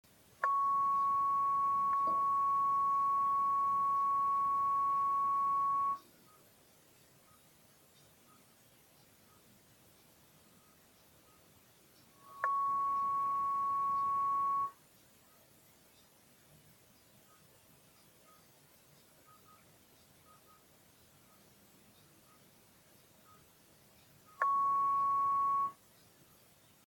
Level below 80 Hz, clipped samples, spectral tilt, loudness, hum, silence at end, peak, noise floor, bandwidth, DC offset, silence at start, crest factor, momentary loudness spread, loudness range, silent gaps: -78 dBFS; under 0.1%; -3.5 dB/octave; -32 LUFS; none; 1.15 s; -16 dBFS; -65 dBFS; 17.5 kHz; under 0.1%; 0.4 s; 20 dB; 4 LU; 10 LU; none